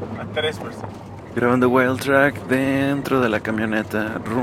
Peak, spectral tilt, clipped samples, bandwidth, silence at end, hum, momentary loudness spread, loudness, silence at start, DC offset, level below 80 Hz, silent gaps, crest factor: 0 dBFS; -6 dB/octave; under 0.1%; 16 kHz; 0 s; none; 14 LU; -20 LUFS; 0 s; under 0.1%; -52 dBFS; none; 20 dB